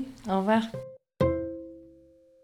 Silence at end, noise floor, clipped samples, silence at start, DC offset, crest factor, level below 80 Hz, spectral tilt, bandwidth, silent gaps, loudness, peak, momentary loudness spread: 0.55 s; -57 dBFS; under 0.1%; 0 s; under 0.1%; 20 dB; -54 dBFS; -7.5 dB/octave; 13 kHz; none; -28 LUFS; -12 dBFS; 19 LU